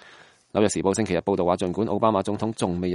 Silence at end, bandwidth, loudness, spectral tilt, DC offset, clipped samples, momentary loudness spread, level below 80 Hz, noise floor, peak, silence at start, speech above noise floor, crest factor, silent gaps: 0 s; 11.5 kHz; -24 LUFS; -5.5 dB/octave; under 0.1%; under 0.1%; 4 LU; -54 dBFS; -52 dBFS; -6 dBFS; 0.55 s; 28 dB; 18 dB; none